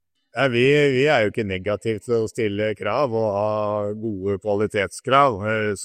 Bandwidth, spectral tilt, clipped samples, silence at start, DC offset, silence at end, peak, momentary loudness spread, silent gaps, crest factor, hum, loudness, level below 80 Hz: 13 kHz; -5.5 dB/octave; under 0.1%; 0.35 s; under 0.1%; 0 s; -2 dBFS; 9 LU; none; 18 dB; none; -21 LUFS; -60 dBFS